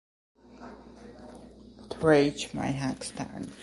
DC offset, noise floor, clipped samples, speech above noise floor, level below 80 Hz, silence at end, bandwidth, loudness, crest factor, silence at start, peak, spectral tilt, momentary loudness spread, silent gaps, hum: under 0.1%; -50 dBFS; under 0.1%; 22 dB; -56 dBFS; 0 s; 11.5 kHz; -28 LUFS; 22 dB; 0.55 s; -10 dBFS; -5.5 dB/octave; 26 LU; none; none